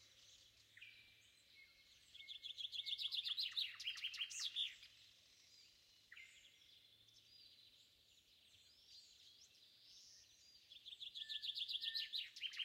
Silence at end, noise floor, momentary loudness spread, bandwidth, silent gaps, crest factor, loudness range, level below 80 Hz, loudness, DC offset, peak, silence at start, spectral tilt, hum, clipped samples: 0 s; -72 dBFS; 24 LU; 16 kHz; none; 22 dB; 20 LU; under -90 dBFS; -45 LUFS; under 0.1%; -32 dBFS; 0 s; 3 dB/octave; none; under 0.1%